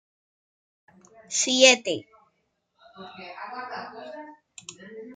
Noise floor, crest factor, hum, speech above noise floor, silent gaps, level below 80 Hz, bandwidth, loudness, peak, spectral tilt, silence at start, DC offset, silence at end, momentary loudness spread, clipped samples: -74 dBFS; 26 dB; none; 52 dB; none; -80 dBFS; 10 kHz; -21 LUFS; -2 dBFS; -0.5 dB/octave; 1.3 s; under 0.1%; 0 s; 27 LU; under 0.1%